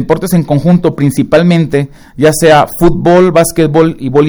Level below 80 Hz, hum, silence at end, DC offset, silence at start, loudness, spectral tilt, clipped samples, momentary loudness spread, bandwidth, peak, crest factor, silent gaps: -30 dBFS; none; 0 s; under 0.1%; 0 s; -9 LUFS; -6.5 dB/octave; 2%; 5 LU; over 20 kHz; 0 dBFS; 8 dB; none